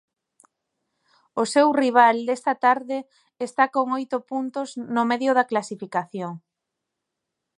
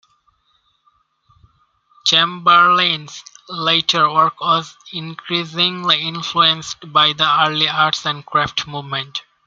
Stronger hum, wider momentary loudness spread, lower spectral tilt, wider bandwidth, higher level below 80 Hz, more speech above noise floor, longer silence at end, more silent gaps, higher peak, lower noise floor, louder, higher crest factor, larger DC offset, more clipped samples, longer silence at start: neither; about the same, 15 LU vs 14 LU; first, -4.5 dB/octave vs -3 dB/octave; first, 11.5 kHz vs 7.6 kHz; second, -80 dBFS vs -60 dBFS; first, 61 dB vs 45 dB; first, 1.2 s vs 0.25 s; neither; about the same, -2 dBFS vs 0 dBFS; first, -83 dBFS vs -62 dBFS; second, -22 LUFS vs -15 LUFS; about the same, 22 dB vs 18 dB; neither; neither; second, 1.35 s vs 2.05 s